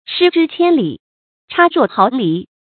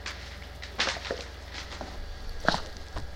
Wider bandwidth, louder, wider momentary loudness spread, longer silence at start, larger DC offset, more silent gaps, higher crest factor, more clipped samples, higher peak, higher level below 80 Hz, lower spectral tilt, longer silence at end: second, 4.6 kHz vs 16.5 kHz; first, -14 LUFS vs -34 LUFS; about the same, 11 LU vs 13 LU; about the same, 0.1 s vs 0 s; neither; first, 1.00-1.48 s vs none; second, 14 dB vs 30 dB; neither; first, 0 dBFS vs -4 dBFS; second, -64 dBFS vs -42 dBFS; first, -8.5 dB/octave vs -3 dB/octave; first, 0.3 s vs 0 s